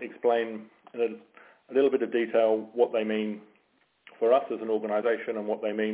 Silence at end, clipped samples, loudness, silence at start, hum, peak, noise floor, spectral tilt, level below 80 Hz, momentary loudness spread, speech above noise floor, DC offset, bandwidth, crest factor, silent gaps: 0 s; under 0.1%; -28 LUFS; 0 s; none; -10 dBFS; -69 dBFS; -9 dB/octave; -82 dBFS; 11 LU; 42 dB; under 0.1%; 4 kHz; 18 dB; none